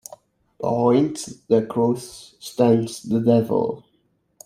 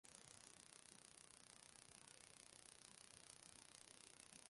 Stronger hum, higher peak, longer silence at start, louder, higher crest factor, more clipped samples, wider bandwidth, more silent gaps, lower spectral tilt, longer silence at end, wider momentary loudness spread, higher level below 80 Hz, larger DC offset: neither; first, -4 dBFS vs -38 dBFS; first, 0.6 s vs 0.05 s; first, -21 LUFS vs -63 LUFS; second, 18 dB vs 28 dB; neither; first, 15 kHz vs 11.5 kHz; neither; first, -7 dB/octave vs -1 dB/octave; first, 0.65 s vs 0 s; first, 17 LU vs 1 LU; first, -62 dBFS vs -88 dBFS; neither